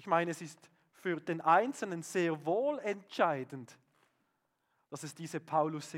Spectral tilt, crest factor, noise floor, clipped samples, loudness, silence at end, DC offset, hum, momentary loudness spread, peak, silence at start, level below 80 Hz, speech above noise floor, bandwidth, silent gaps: -5 dB/octave; 22 dB; -80 dBFS; under 0.1%; -34 LUFS; 0 s; under 0.1%; none; 17 LU; -14 dBFS; 0 s; under -90 dBFS; 46 dB; 16.5 kHz; none